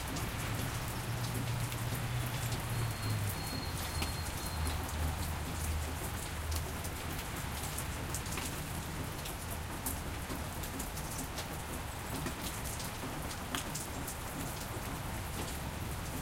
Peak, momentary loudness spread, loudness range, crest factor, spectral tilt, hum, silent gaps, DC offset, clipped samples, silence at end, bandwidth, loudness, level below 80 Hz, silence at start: -16 dBFS; 4 LU; 3 LU; 22 dB; -4 dB/octave; none; none; under 0.1%; under 0.1%; 0 s; 17 kHz; -38 LUFS; -44 dBFS; 0 s